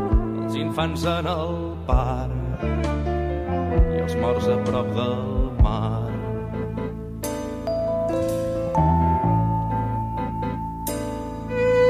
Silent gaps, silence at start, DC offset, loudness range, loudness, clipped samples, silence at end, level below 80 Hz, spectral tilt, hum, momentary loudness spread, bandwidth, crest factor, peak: none; 0 s; under 0.1%; 2 LU; -24 LUFS; under 0.1%; 0 s; -30 dBFS; -7 dB/octave; none; 8 LU; 15.5 kHz; 18 dB; -6 dBFS